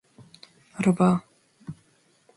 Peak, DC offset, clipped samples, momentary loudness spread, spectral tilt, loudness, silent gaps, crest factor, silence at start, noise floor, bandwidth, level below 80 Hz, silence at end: -10 dBFS; under 0.1%; under 0.1%; 23 LU; -7.5 dB/octave; -23 LUFS; none; 18 dB; 0.8 s; -63 dBFS; 11.5 kHz; -64 dBFS; 0.65 s